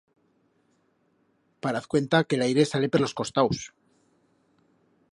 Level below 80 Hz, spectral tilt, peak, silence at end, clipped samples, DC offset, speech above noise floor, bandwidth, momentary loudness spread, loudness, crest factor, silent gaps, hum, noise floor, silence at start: -62 dBFS; -5.5 dB/octave; -8 dBFS; 1.45 s; under 0.1%; under 0.1%; 44 dB; 11.5 kHz; 10 LU; -25 LUFS; 22 dB; none; none; -69 dBFS; 1.65 s